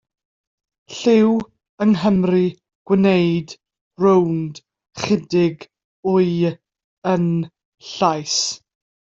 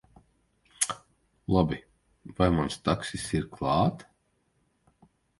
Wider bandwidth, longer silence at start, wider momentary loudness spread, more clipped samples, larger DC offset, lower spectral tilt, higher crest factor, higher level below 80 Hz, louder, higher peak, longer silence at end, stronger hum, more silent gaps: second, 7.8 kHz vs 12 kHz; about the same, 0.9 s vs 0.8 s; about the same, 18 LU vs 16 LU; neither; neither; about the same, -5.5 dB/octave vs -5 dB/octave; second, 16 dB vs 24 dB; second, -58 dBFS vs -46 dBFS; first, -19 LUFS vs -28 LUFS; first, -2 dBFS vs -8 dBFS; second, 0.55 s vs 1.35 s; neither; first, 1.69-1.78 s, 2.75-2.85 s, 3.81-3.91 s, 5.84-6.03 s, 6.84-7.02 s, 7.65-7.72 s vs none